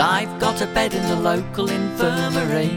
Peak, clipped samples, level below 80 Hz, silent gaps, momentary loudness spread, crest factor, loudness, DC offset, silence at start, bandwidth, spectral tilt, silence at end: -2 dBFS; under 0.1%; -44 dBFS; none; 3 LU; 18 dB; -21 LUFS; under 0.1%; 0 s; 18 kHz; -5 dB/octave; 0 s